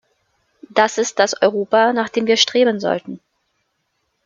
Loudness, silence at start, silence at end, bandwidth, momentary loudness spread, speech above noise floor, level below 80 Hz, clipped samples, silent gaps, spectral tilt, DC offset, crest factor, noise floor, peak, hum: -17 LUFS; 0.75 s; 1.1 s; 7.6 kHz; 9 LU; 54 dB; -66 dBFS; under 0.1%; none; -2.5 dB/octave; under 0.1%; 18 dB; -70 dBFS; 0 dBFS; none